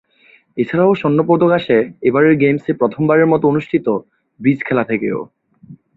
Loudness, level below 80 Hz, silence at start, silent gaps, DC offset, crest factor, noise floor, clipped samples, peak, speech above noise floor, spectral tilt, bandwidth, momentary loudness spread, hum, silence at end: -15 LUFS; -56 dBFS; 0.55 s; none; under 0.1%; 14 dB; -51 dBFS; under 0.1%; -2 dBFS; 37 dB; -10 dB/octave; 4.6 kHz; 10 LU; none; 0.2 s